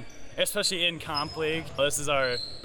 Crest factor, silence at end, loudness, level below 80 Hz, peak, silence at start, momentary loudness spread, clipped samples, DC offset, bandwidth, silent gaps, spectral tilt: 16 dB; 0 s; -27 LUFS; -54 dBFS; -12 dBFS; 0 s; 6 LU; under 0.1%; under 0.1%; 19 kHz; none; -2 dB/octave